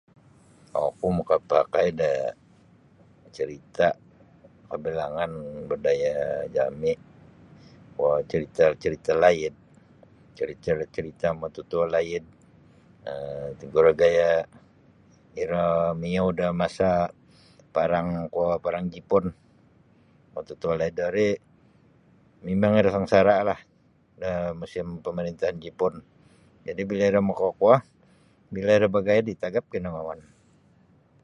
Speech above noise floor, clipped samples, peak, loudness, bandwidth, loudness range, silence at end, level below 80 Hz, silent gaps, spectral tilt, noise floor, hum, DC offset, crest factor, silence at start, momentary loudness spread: 37 dB; under 0.1%; -4 dBFS; -25 LUFS; 9.6 kHz; 6 LU; 1.05 s; -54 dBFS; none; -7 dB/octave; -61 dBFS; none; under 0.1%; 22 dB; 0.75 s; 14 LU